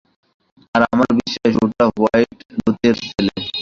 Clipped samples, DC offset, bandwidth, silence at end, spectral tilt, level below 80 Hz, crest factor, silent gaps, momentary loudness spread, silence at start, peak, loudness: under 0.1%; under 0.1%; 7.4 kHz; 0 s; -6 dB/octave; -48 dBFS; 16 dB; 2.45-2.49 s; 6 LU; 0.75 s; -2 dBFS; -17 LUFS